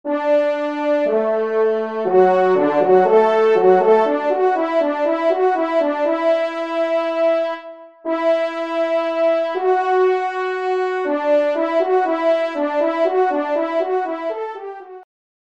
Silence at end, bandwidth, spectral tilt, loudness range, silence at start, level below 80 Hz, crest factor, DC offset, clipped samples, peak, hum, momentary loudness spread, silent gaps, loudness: 0.4 s; 7.8 kHz; -6.5 dB/octave; 5 LU; 0.05 s; -72 dBFS; 16 dB; 0.1%; under 0.1%; -2 dBFS; none; 8 LU; none; -18 LUFS